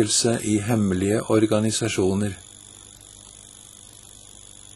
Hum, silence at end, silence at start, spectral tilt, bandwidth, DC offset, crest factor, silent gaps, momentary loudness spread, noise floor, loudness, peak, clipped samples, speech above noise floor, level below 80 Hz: 50 Hz at -50 dBFS; 1.2 s; 0 s; -4.5 dB/octave; 13 kHz; under 0.1%; 18 dB; none; 23 LU; -46 dBFS; -22 LUFS; -6 dBFS; under 0.1%; 24 dB; -54 dBFS